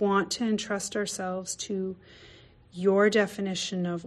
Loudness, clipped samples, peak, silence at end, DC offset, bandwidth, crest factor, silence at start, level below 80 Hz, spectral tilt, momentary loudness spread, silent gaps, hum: -28 LUFS; under 0.1%; -12 dBFS; 0 s; under 0.1%; 13 kHz; 16 dB; 0 s; -64 dBFS; -4 dB/octave; 11 LU; none; none